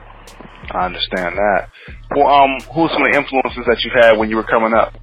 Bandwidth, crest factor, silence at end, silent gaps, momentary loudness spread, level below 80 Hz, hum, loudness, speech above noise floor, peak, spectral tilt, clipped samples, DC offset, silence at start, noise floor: 11 kHz; 16 dB; 0 s; none; 10 LU; -38 dBFS; none; -15 LUFS; 23 dB; 0 dBFS; -5.5 dB/octave; under 0.1%; 0.1%; 0 s; -38 dBFS